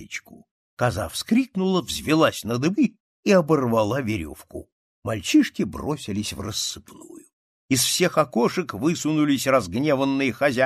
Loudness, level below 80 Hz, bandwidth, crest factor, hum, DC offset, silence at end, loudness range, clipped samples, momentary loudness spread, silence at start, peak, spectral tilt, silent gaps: -22 LUFS; -52 dBFS; 14.5 kHz; 18 dB; none; under 0.1%; 0 s; 4 LU; under 0.1%; 10 LU; 0 s; -4 dBFS; -4.5 dB/octave; 0.51-0.77 s, 3.00-3.23 s, 4.72-5.03 s, 7.33-7.69 s